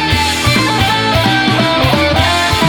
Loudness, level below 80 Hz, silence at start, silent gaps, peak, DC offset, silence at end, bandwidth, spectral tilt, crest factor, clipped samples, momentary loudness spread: -11 LUFS; -28 dBFS; 0 s; none; 0 dBFS; under 0.1%; 0 s; 19 kHz; -4 dB/octave; 12 dB; under 0.1%; 1 LU